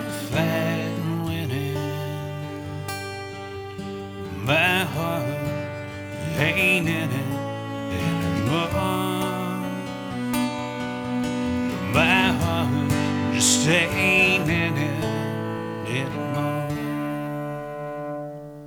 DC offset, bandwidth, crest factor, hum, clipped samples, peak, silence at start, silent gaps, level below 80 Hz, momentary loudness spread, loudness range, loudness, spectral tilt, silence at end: under 0.1%; over 20 kHz; 20 dB; none; under 0.1%; -4 dBFS; 0 s; none; -50 dBFS; 14 LU; 8 LU; -24 LUFS; -4.5 dB/octave; 0 s